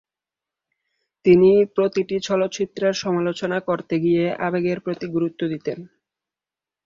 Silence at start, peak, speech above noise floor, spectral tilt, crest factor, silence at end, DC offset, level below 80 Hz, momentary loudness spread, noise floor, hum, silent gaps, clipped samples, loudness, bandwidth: 1.25 s; -4 dBFS; 70 dB; -6.5 dB/octave; 18 dB; 1 s; under 0.1%; -60 dBFS; 11 LU; -90 dBFS; none; none; under 0.1%; -21 LUFS; 7.6 kHz